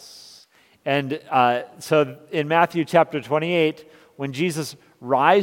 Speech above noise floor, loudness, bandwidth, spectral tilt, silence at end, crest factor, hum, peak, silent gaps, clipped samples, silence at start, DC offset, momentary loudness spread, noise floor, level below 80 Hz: 34 dB; -21 LUFS; 17 kHz; -5.5 dB/octave; 0 s; 22 dB; none; 0 dBFS; none; under 0.1%; 0 s; under 0.1%; 14 LU; -54 dBFS; -72 dBFS